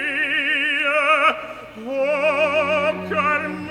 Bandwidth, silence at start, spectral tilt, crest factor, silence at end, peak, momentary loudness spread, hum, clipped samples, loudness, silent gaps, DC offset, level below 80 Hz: 13 kHz; 0 s; -4 dB/octave; 16 dB; 0 s; -4 dBFS; 11 LU; none; under 0.1%; -19 LUFS; none; under 0.1%; -58 dBFS